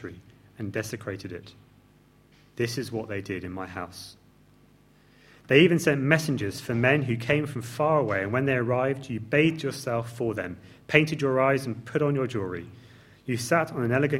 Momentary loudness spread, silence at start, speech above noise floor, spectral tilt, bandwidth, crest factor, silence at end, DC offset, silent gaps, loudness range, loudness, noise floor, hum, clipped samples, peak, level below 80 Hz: 16 LU; 0 s; 32 dB; -6 dB/octave; 16.5 kHz; 26 dB; 0 s; under 0.1%; none; 11 LU; -26 LUFS; -58 dBFS; none; under 0.1%; -2 dBFS; -62 dBFS